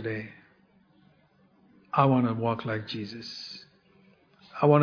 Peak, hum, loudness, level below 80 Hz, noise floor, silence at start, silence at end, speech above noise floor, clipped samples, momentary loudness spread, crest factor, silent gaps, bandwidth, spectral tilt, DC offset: -8 dBFS; none; -28 LUFS; -68 dBFS; -63 dBFS; 0 s; 0 s; 35 dB; under 0.1%; 20 LU; 22 dB; none; 5.4 kHz; -8 dB/octave; under 0.1%